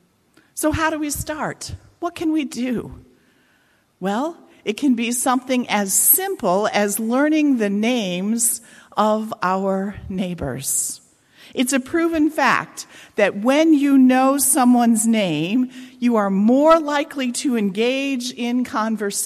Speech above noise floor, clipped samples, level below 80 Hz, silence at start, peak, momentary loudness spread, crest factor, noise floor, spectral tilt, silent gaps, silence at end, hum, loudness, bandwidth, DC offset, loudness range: 41 dB; under 0.1%; -48 dBFS; 0.55 s; -2 dBFS; 13 LU; 18 dB; -60 dBFS; -3.5 dB/octave; none; 0 s; none; -19 LUFS; 14.5 kHz; under 0.1%; 8 LU